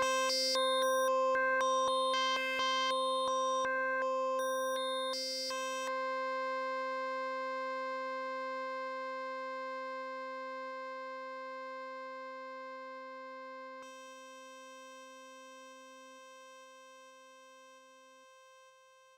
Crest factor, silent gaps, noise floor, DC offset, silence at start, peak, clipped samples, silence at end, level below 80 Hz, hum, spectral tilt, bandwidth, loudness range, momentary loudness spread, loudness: 14 dB; none; -62 dBFS; under 0.1%; 0 s; -24 dBFS; under 0.1%; 0.45 s; -84 dBFS; none; 0 dB/octave; 16.5 kHz; 21 LU; 22 LU; -35 LUFS